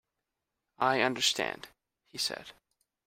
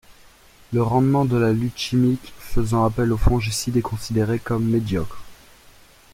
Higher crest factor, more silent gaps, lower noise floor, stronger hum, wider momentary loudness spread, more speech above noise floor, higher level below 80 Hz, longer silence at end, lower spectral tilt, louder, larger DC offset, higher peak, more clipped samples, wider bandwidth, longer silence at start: first, 24 dB vs 18 dB; neither; first, -87 dBFS vs -50 dBFS; neither; first, 17 LU vs 8 LU; first, 56 dB vs 30 dB; second, -72 dBFS vs -34 dBFS; second, 0.55 s vs 0.8 s; second, -2 dB/octave vs -6.5 dB/octave; second, -30 LUFS vs -21 LUFS; neither; second, -10 dBFS vs -4 dBFS; neither; about the same, 16 kHz vs 16 kHz; first, 0.8 s vs 0.1 s